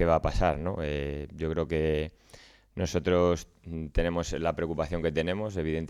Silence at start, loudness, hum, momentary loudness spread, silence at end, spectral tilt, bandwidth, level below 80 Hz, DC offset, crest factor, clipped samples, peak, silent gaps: 0 s; -30 LUFS; none; 9 LU; 0 s; -6.5 dB/octave; 13.5 kHz; -40 dBFS; under 0.1%; 18 dB; under 0.1%; -10 dBFS; none